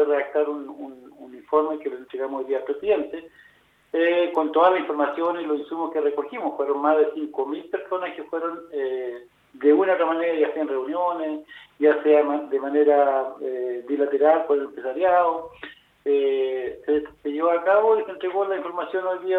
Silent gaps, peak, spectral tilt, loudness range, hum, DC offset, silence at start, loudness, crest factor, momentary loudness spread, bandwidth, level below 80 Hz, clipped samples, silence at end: none; -6 dBFS; -6.5 dB/octave; 4 LU; none; under 0.1%; 0 s; -23 LUFS; 18 dB; 12 LU; 4.1 kHz; -68 dBFS; under 0.1%; 0 s